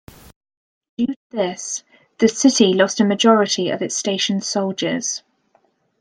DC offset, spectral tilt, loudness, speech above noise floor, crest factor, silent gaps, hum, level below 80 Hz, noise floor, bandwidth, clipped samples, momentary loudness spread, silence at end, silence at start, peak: under 0.1%; -3.5 dB/octave; -18 LUFS; 44 dB; 18 dB; 1.16-1.30 s; none; -62 dBFS; -61 dBFS; 10.5 kHz; under 0.1%; 12 LU; 0.8 s; 1 s; -2 dBFS